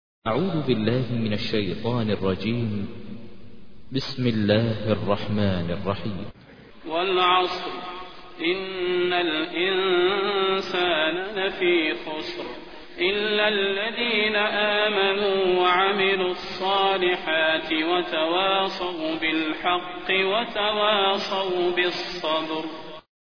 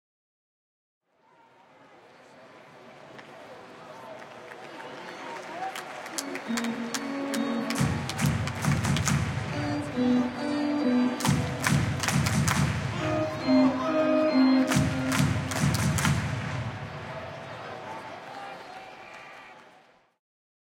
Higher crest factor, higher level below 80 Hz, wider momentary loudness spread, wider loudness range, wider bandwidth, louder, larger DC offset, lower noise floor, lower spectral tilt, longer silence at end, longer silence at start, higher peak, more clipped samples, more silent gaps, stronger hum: about the same, 18 dB vs 22 dB; about the same, -54 dBFS vs -52 dBFS; second, 11 LU vs 20 LU; second, 5 LU vs 18 LU; second, 5.4 kHz vs 17 kHz; first, -23 LUFS vs -27 LUFS; first, 0.6% vs under 0.1%; second, -48 dBFS vs -61 dBFS; first, -6.5 dB/octave vs -5 dB/octave; second, 0.1 s vs 1.05 s; second, 0.2 s vs 2.3 s; about the same, -6 dBFS vs -8 dBFS; neither; neither; neither